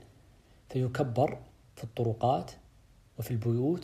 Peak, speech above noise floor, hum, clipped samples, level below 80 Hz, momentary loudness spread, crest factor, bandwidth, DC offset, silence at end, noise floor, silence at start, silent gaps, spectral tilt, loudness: -14 dBFS; 30 dB; none; under 0.1%; -60 dBFS; 17 LU; 18 dB; 15 kHz; under 0.1%; 0 s; -60 dBFS; 0 s; none; -8 dB/octave; -32 LUFS